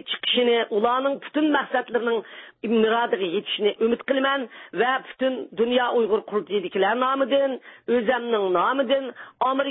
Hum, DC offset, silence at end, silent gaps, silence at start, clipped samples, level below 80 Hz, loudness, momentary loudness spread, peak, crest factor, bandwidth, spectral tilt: none; under 0.1%; 0 s; none; 0.05 s; under 0.1%; -68 dBFS; -23 LUFS; 6 LU; -8 dBFS; 16 dB; 4 kHz; -9 dB/octave